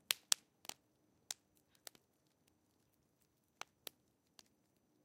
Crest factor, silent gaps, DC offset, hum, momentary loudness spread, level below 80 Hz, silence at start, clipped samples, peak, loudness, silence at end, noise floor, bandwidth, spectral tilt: 44 dB; none; under 0.1%; none; 22 LU; under -90 dBFS; 0.1 s; under 0.1%; -6 dBFS; -42 LUFS; 3.7 s; -79 dBFS; 16.5 kHz; 2.5 dB/octave